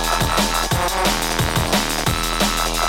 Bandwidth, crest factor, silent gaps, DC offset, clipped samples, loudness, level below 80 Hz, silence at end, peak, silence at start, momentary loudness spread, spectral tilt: 17 kHz; 16 dB; none; 0.8%; under 0.1%; -18 LUFS; -28 dBFS; 0 s; -4 dBFS; 0 s; 2 LU; -3 dB/octave